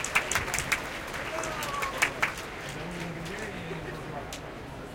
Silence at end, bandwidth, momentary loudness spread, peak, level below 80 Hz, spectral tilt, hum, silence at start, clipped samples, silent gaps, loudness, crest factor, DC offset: 0 s; 17 kHz; 11 LU; -8 dBFS; -50 dBFS; -2.5 dB/octave; none; 0 s; under 0.1%; none; -32 LUFS; 26 dB; under 0.1%